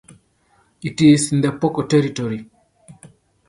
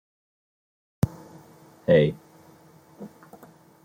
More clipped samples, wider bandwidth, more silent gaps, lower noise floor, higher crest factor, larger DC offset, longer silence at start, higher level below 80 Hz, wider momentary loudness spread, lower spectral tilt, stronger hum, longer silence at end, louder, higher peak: neither; second, 11.5 kHz vs 16.5 kHz; neither; first, -60 dBFS vs -53 dBFS; second, 18 dB vs 24 dB; neither; second, 0.85 s vs 1.05 s; about the same, -56 dBFS vs -56 dBFS; second, 16 LU vs 25 LU; second, -6 dB/octave vs -7.5 dB/octave; neither; second, 0.45 s vs 0.75 s; first, -17 LUFS vs -24 LUFS; first, -2 dBFS vs -6 dBFS